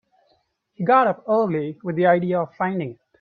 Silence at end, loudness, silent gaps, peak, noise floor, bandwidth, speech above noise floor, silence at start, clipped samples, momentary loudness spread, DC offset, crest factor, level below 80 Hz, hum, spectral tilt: 0.25 s; -21 LUFS; none; -4 dBFS; -66 dBFS; 4.9 kHz; 46 dB; 0.8 s; under 0.1%; 10 LU; under 0.1%; 18 dB; -68 dBFS; none; -10 dB/octave